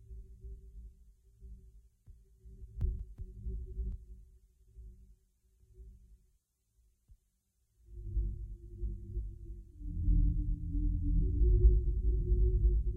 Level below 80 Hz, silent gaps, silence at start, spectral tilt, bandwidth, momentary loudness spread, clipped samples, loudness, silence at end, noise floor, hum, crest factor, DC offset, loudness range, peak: -34 dBFS; none; 0.1 s; -12.5 dB/octave; 0.5 kHz; 25 LU; under 0.1%; -35 LUFS; 0 s; -78 dBFS; none; 20 dB; under 0.1%; 16 LU; -14 dBFS